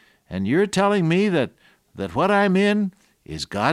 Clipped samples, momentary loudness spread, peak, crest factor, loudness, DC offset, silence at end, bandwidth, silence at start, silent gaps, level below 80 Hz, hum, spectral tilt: under 0.1%; 14 LU; -4 dBFS; 18 dB; -21 LUFS; under 0.1%; 0 s; 12.5 kHz; 0.3 s; none; -54 dBFS; none; -6 dB/octave